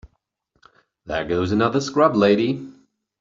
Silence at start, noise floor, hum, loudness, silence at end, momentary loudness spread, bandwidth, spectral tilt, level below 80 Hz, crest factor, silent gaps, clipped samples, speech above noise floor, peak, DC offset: 1.05 s; -69 dBFS; none; -20 LUFS; 0.5 s; 13 LU; 7.6 kHz; -6 dB/octave; -52 dBFS; 20 dB; none; under 0.1%; 50 dB; -2 dBFS; under 0.1%